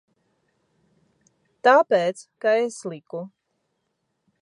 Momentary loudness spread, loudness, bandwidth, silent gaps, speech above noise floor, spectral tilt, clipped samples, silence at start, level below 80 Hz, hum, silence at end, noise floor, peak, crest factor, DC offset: 18 LU; -21 LUFS; 11 kHz; none; 54 dB; -4.5 dB/octave; under 0.1%; 1.65 s; -84 dBFS; none; 1.15 s; -75 dBFS; -4 dBFS; 22 dB; under 0.1%